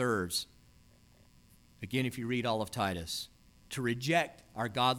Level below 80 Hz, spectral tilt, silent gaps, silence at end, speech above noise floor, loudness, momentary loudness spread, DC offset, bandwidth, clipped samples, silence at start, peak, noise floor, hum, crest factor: -62 dBFS; -4.5 dB/octave; none; 0 s; 29 dB; -34 LUFS; 11 LU; under 0.1%; 18.5 kHz; under 0.1%; 0 s; -16 dBFS; -62 dBFS; none; 20 dB